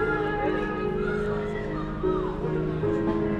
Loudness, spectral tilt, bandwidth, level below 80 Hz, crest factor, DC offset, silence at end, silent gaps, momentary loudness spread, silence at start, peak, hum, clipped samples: -28 LUFS; -8.5 dB/octave; 8.8 kHz; -40 dBFS; 12 dB; under 0.1%; 0 s; none; 4 LU; 0 s; -14 dBFS; none; under 0.1%